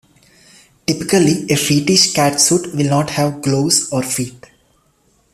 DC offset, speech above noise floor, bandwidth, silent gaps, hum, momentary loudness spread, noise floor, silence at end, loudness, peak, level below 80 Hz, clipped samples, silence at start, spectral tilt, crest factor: under 0.1%; 43 dB; 15 kHz; none; none; 9 LU; -58 dBFS; 1 s; -15 LUFS; 0 dBFS; -52 dBFS; under 0.1%; 0.9 s; -3.5 dB/octave; 16 dB